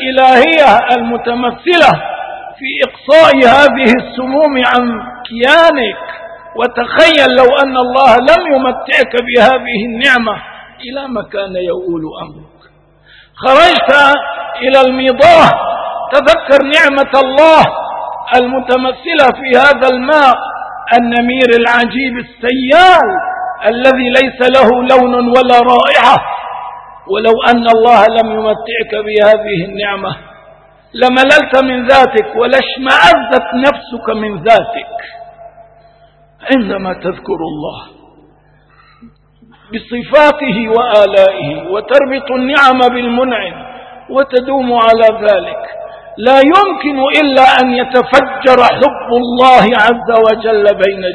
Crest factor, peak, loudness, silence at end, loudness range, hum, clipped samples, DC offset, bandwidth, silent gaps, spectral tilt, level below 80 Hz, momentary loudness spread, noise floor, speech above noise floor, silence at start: 10 dB; 0 dBFS; -9 LUFS; 0 s; 7 LU; 50 Hz at -45 dBFS; 2%; under 0.1%; 11 kHz; none; -4.5 dB/octave; -42 dBFS; 15 LU; -46 dBFS; 38 dB; 0 s